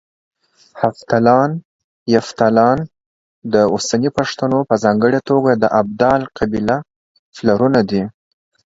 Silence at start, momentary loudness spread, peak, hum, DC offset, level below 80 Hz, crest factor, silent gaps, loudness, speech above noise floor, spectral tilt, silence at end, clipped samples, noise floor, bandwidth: 0.75 s; 8 LU; 0 dBFS; none; under 0.1%; -48 dBFS; 16 dB; 1.65-2.06 s, 3.06-3.42 s, 6.96-7.32 s; -16 LUFS; 27 dB; -6 dB/octave; 0.55 s; under 0.1%; -41 dBFS; 7.8 kHz